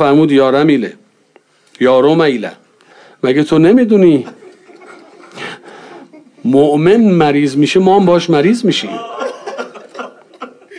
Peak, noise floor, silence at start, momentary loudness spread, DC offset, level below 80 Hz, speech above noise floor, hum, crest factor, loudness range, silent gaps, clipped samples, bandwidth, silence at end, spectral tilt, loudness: 0 dBFS; -50 dBFS; 0 s; 20 LU; under 0.1%; -54 dBFS; 41 dB; none; 12 dB; 3 LU; none; under 0.1%; 10.5 kHz; 0 s; -6.5 dB/octave; -11 LUFS